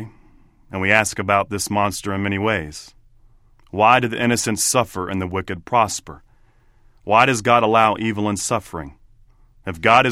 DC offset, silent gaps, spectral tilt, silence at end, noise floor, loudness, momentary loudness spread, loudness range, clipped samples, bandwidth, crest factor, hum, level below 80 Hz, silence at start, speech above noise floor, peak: under 0.1%; none; -4 dB/octave; 0 s; -53 dBFS; -18 LUFS; 18 LU; 2 LU; under 0.1%; 16.5 kHz; 20 dB; none; -48 dBFS; 0 s; 35 dB; 0 dBFS